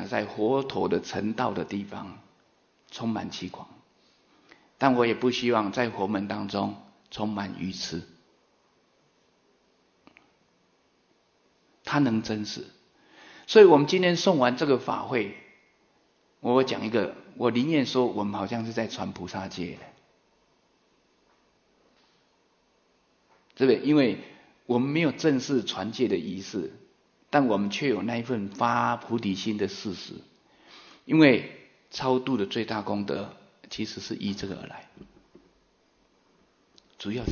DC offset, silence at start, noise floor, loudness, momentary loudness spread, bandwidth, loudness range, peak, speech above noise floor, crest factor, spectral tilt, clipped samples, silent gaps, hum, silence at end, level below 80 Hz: under 0.1%; 0 s; -67 dBFS; -26 LUFS; 17 LU; 7 kHz; 15 LU; -4 dBFS; 41 dB; 24 dB; -5.5 dB/octave; under 0.1%; none; none; 0 s; -66 dBFS